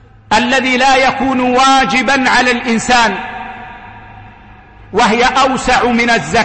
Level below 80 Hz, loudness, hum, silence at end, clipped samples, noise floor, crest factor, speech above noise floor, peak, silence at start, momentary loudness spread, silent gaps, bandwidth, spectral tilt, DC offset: -36 dBFS; -11 LUFS; none; 0 s; under 0.1%; -38 dBFS; 12 dB; 27 dB; -2 dBFS; 0.3 s; 12 LU; none; 8.8 kHz; -3 dB/octave; under 0.1%